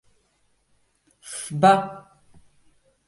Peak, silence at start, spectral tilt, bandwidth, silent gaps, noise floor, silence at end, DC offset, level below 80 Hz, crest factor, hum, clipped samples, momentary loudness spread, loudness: -2 dBFS; 1.25 s; -5 dB/octave; 11.5 kHz; none; -67 dBFS; 1.1 s; under 0.1%; -64 dBFS; 24 dB; none; under 0.1%; 19 LU; -20 LUFS